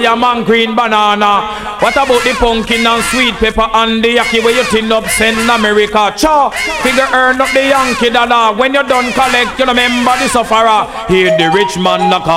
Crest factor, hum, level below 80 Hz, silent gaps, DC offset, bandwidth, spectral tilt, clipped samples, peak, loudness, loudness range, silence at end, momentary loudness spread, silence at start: 10 dB; none; -32 dBFS; none; under 0.1%; 16.5 kHz; -3 dB/octave; under 0.1%; 0 dBFS; -10 LUFS; 1 LU; 0 s; 3 LU; 0 s